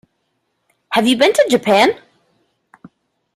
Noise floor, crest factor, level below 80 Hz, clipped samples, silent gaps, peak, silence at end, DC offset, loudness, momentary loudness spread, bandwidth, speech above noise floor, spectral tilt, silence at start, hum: -69 dBFS; 16 dB; -60 dBFS; under 0.1%; none; 0 dBFS; 1.4 s; under 0.1%; -14 LUFS; 7 LU; 15.5 kHz; 56 dB; -3.5 dB/octave; 0.9 s; none